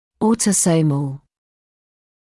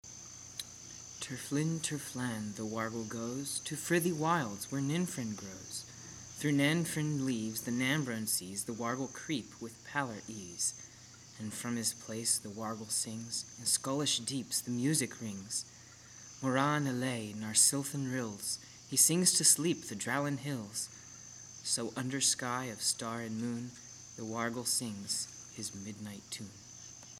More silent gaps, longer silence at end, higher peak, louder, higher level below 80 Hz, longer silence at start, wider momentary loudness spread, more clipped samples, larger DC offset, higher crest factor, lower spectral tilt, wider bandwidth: neither; first, 1.05 s vs 0 s; first, -6 dBFS vs -10 dBFS; first, -17 LUFS vs -34 LUFS; first, -56 dBFS vs -72 dBFS; first, 0.2 s vs 0.05 s; second, 13 LU vs 17 LU; neither; neither; second, 14 dB vs 26 dB; first, -5 dB/octave vs -3 dB/octave; second, 12 kHz vs 17 kHz